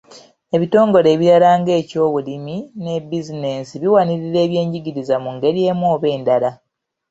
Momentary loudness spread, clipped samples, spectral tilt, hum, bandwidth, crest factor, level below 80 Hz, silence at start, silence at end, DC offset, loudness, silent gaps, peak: 13 LU; under 0.1%; -7.5 dB/octave; none; 8 kHz; 16 dB; -60 dBFS; 0.1 s; 0.55 s; under 0.1%; -17 LUFS; none; -2 dBFS